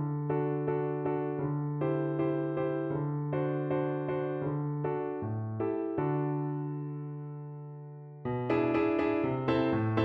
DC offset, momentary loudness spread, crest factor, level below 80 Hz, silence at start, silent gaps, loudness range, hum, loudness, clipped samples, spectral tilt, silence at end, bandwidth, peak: under 0.1%; 11 LU; 18 dB; -64 dBFS; 0 s; none; 3 LU; none; -32 LUFS; under 0.1%; -10.5 dB/octave; 0 s; 5.4 kHz; -14 dBFS